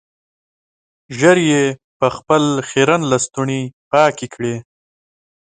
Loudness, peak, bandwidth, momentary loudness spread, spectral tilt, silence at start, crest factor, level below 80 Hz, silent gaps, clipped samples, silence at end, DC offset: -16 LUFS; 0 dBFS; 9.6 kHz; 11 LU; -4.5 dB/octave; 1.1 s; 18 dB; -56 dBFS; 1.84-2.00 s, 3.73-3.91 s; under 0.1%; 0.95 s; under 0.1%